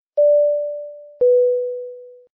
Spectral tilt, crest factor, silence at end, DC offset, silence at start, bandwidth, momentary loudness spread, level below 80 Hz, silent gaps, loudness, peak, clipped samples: -8 dB/octave; 10 dB; 0.25 s; under 0.1%; 0.15 s; 1.1 kHz; 18 LU; -70 dBFS; none; -18 LUFS; -10 dBFS; under 0.1%